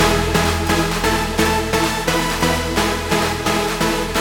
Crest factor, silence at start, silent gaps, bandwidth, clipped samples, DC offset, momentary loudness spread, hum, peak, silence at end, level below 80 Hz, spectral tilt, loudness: 16 dB; 0 s; none; 19 kHz; under 0.1%; under 0.1%; 2 LU; none; -2 dBFS; 0 s; -30 dBFS; -4 dB/octave; -18 LUFS